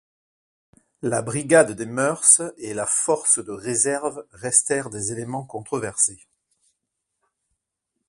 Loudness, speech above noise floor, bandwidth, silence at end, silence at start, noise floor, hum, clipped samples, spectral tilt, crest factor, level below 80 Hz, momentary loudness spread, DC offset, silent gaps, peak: -20 LUFS; 58 dB; 11.5 kHz; 1.95 s; 1.05 s; -80 dBFS; none; under 0.1%; -3 dB/octave; 24 dB; -62 dBFS; 14 LU; under 0.1%; none; 0 dBFS